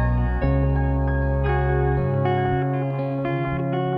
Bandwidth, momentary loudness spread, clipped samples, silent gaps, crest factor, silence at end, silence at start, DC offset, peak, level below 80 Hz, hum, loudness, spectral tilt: 4.2 kHz; 3 LU; under 0.1%; none; 12 dB; 0 s; 0 s; under 0.1%; -10 dBFS; -26 dBFS; none; -23 LUFS; -10.5 dB/octave